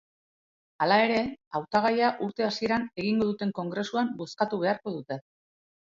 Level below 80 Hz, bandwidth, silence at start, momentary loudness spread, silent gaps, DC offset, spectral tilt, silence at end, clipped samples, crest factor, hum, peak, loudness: -66 dBFS; 7.6 kHz; 0.8 s; 10 LU; 1.47-1.51 s; under 0.1%; -6 dB/octave; 0.75 s; under 0.1%; 18 dB; none; -10 dBFS; -28 LUFS